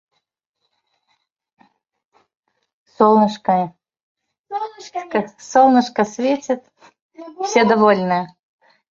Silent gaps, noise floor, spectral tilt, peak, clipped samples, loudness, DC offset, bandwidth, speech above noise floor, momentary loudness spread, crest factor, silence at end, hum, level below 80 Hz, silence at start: 4.03-4.15 s, 4.39-4.44 s, 7.02-7.10 s; -75 dBFS; -5.5 dB/octave; -2 dBFS; under 0.1%; -17 LUFS; under 0.1%; 7.6 kHz; 58 dB; 15 LU; 18 dB; 0.65 s; none; -66 dBFS; 3 s